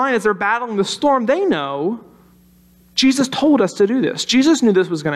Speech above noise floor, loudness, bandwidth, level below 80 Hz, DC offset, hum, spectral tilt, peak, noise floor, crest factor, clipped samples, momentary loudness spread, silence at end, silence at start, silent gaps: 34 dB; -16 LUFS; 13 kHz; -58 dBFS; under 0.1%; none; -4 dB/octave; -4 dBFS; -50 dBFS; 12 dB; under 0.1%; 8 LU; 0 s; 0 s; none